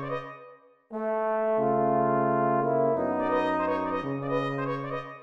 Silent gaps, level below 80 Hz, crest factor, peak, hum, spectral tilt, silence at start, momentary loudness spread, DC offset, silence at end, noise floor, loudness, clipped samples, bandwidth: none; -66 dBFS; 14 dB; -14 dBFS; none; -8.5 dB/octave; 0 s; 10 LU; 0.1%; 0 s; -52 dBFS; -27 LUFS; under 0.1%; 7.2 kHz